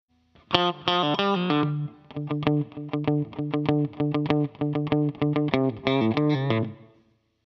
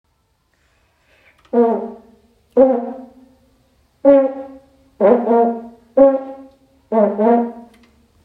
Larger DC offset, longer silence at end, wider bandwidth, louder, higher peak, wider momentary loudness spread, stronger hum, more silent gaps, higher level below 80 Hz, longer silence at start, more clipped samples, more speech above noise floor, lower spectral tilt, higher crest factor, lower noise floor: neither; about the same, 0.65 s vs 0.65 s; first, 6.2 kHz vs 4.1 kHz; second, -25 LUFS vs -16 LUFS; about the same, 0 dBFS vs 0 dBFS; second, 6 LU vs 18 LU; neither; neither; about the same, -60 dBFS vs -58 dBFS; second, 0.5 s vs 1.55 s; neither; second, 39 dB vs 50 dB; second, -8 dB/octave vs -9.5 dB/octave; first, 26 dB vs 18 dB; about the same, -64 dBFS vs -63 dBFS